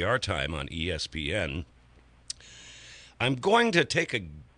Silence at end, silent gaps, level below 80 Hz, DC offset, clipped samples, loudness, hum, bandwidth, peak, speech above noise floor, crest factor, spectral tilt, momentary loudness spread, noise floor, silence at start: 0.15 s; none; -46 dBFS; under 0.1%; under 0.1%; -28 LUFS; none; 10.5 kHz; -10 dBFS; 29 dB; 20 dB; -4.5 dB/octave; 23 LU; -57 dBFS; 0 s